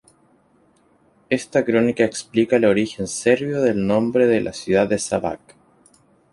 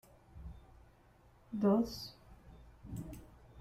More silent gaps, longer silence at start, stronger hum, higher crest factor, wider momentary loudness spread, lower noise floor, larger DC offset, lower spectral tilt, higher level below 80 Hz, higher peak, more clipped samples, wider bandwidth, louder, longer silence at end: neither; first, 1.3 s vs 0.35 s; neither; about the same, 18 dB vs 20 dB; second, 8 LU vs 28 LU; second, -58 dBFS vs -65 dBFS; neither; second, -5 dB/octave vs -7 dB/octave; about the same, -54 dBFS vs -58 dBFS; first, -2 dBFS vs -20 dBFS; neither; second, 11.5 kHz vs 15.5 kHz; first, -20 LUFS vs -37 LUFS; first, 0.95 s vs 0 s